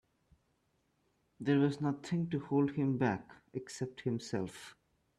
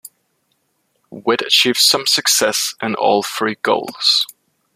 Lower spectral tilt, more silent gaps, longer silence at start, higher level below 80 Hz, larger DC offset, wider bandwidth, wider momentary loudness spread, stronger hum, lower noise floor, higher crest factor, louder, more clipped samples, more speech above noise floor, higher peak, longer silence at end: first, -7 dB/octave vs -1 dB/octave; neither; first, 1.4 s vs 0.05 s; second, -72 dBFS vs -66 dBFS; neither; second, 11.5 kHz vs 15.5 kHz; first, 14 LU vs 9 LU; neither; first, -77 dBFS vs -66 dBFS; about the same, 18 dB vs 18 dB; second, -35 LUFS vs -15 LUFS; neither; second, 43 dB vs 50 dB; second, -18 dBFS vs 0 dBFS; about the same, 0.45 s vs 0.5 s